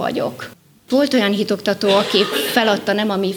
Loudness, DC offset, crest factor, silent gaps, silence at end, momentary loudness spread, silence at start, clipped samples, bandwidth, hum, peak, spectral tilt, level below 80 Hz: -17 LUFS; under 0.1%; 14 dB; none; 0 s; 9 LU; 0 s; under 0.1%; over 20 kHz; none; -2 dBFS; -4.5 dB/octave; -62 dBFS